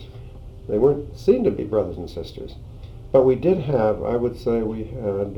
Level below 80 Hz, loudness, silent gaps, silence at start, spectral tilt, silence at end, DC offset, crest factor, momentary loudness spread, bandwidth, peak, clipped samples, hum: -40 dBFS; -21 LUFS; none; 0 s; -9 dB/octave; 0 s; under 0.1%; 18 dB; 22 LU; 7 kHz; -4 dBFS; under 0.1%; none